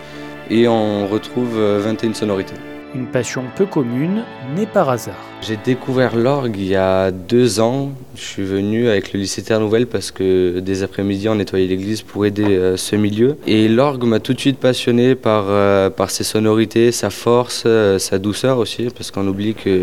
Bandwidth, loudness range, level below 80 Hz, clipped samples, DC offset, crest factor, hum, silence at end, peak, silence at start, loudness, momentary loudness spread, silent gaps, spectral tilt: 16.5 kHz; 5 LU; -52 dBFS; under 0.1%; 0.9%; 16 dB; none; 0 s; 0 dBFS; 0 s; -17 LUFS; 9 LU; none; -5.5 dB/octave